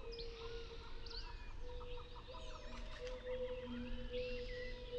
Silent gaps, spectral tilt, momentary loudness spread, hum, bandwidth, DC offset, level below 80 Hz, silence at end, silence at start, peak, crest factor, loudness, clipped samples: none; -5.5 dB/octave; 8 LU; none; 8.2 kHz; under 0.1%; -50 dBFS; 0 s; 0 s; -32 dBFS; 14 dB; -49 LUFS; under 0.1%